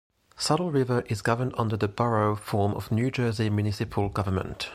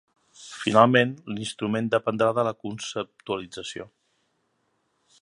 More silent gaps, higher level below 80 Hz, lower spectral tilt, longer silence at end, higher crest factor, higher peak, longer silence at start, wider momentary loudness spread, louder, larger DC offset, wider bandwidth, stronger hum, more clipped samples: neither; first, -52 dBFS vs -66 dBFS; about the same, -6 dB/octave vs -5 dB/octave; second, 0 s vs 1.35 s; second, 18 dB vs 24 dB; second, -8 dBFS vs -2 dBFS; about the same, 0.4 s vs 0.4 s; second, 4 LU vs 17 LU; about the same, -27 LUFS vs -25 LUFS; neither; first, 14.5 kHz vs 11.5 kHz; neither; neither